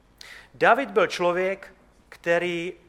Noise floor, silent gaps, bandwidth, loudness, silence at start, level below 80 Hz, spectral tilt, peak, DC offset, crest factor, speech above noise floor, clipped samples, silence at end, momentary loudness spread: -47 dBFS; none; 13.5 kHz; -23 LUFS; 0.25 s; -62 dBFS; -4.5 dB/octave; -4 dBFS; under 0.1%; 22 dB; 24 dB; under 0.1%; 0.15 s; 23 LU